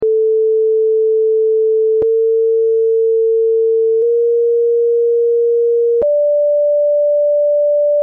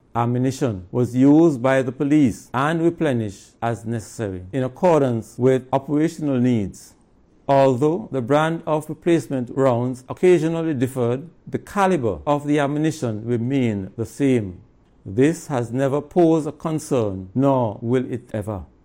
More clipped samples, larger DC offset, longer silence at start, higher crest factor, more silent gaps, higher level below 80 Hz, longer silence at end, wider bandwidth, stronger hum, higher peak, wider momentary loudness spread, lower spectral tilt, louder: neither; neither; second, 0 s vs 0.15 s; second, 4 dB vs 14 dB; neither; second, -62 dBFS vs -52 dBFS; second, 0 s vs 0.2 s; second, 1.1 kHz vs 16.5 kHz; neither; second, -10 dBFS vs -6 dBFS; second, 0 LU vs 10 LU; second, -6 dB/octave vs -7.5 dB/octave; first, -13 LUFS vs -21 LUFS